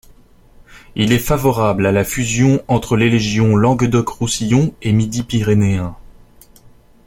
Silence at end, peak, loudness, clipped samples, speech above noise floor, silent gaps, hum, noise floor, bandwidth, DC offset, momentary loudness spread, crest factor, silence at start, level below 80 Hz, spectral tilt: 1.05 s; -2 dBFS; -15 LUFS; under 0.1%; 31 dB; none; none; -45 dBFS; 16.5 kHz; under 0.1%; 5 LU; 14 dB; 0.7 s; -36 dBFS; -6 dB/octave